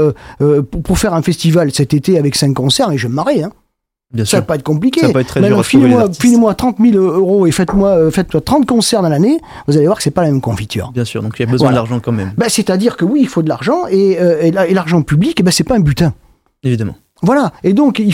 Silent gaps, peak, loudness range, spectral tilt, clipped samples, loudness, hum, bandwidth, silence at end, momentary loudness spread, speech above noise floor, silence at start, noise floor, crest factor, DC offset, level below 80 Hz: none; 0 dBFS; 4 LU; -6 dB/octave; under 0.1%; -12 LUFS; none; 16.5 kHz; 0 s; 7 LU; 50 dB; 0 s; -62 dBFS; 12 dB; under 0.1%; -36 dBFS